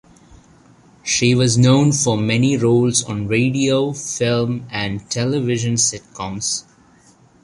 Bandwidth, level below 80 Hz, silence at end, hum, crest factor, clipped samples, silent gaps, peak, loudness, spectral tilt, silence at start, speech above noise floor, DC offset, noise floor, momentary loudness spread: 11.5 kHz; -50 dBFS; 0.8 s; none; 16 dB; under 0.1%; none; -2 dBFS; -17 LUFS; -4.5 dB/octave; 1.05 s; 34 dB; under 0.1%; -51 dBFS; 10 LU